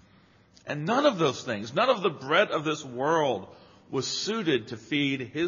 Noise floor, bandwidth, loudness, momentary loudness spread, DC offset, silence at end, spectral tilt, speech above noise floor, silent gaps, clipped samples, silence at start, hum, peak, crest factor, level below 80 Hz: -59 dBFS; 7.4 kHz; -27 LUFS; 9 LU; under 0.1%; 0 s; -3 dB/octave; 32 dB; none; under 0.1%; 0.65 s; none; -8 dBFS; 20 dB; -72 dBFS